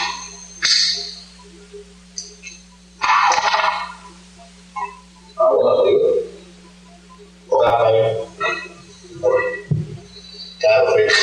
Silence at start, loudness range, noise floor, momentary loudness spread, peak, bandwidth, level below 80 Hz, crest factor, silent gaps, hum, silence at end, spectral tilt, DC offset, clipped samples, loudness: 0 s; 3 LU; -44 dBFS; 21 LU; -4 dBFS; 10 kHz; -52 dBFS; 16 dB; none; none; 0 s; -3 dB/octave; under 0.1%; under 0.1%; -17 LUFS